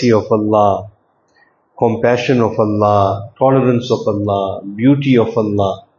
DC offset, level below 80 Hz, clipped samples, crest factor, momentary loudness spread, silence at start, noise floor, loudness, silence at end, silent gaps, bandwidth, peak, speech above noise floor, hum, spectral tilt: under 0.1%; -52 dBFS; under 0.1%; 14 dB; 6 LU; 0 s; -55 dBFS; -14 LUFS; 0.2 s; none; 7.2 kHz; 0 dBFS; 42 dB; none; -7.5 dB/octave